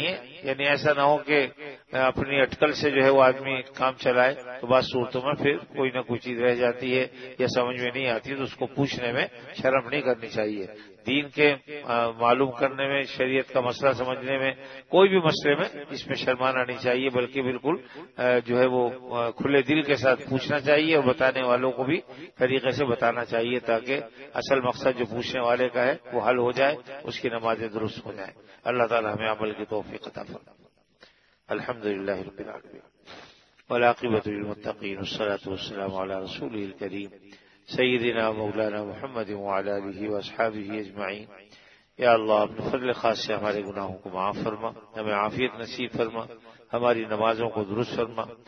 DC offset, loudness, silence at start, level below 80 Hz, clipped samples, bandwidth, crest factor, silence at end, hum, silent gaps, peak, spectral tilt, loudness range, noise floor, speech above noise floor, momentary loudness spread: under 0.1%; -26 LUFS; 0 s; -64 dBFS; under 0.1%; 6.6 kHz; 22 dB; 0.15 s; none; none; -4 dBFS; -6 dB/octave; 7 LU; -58 dBFS; 32 dB; 12 LU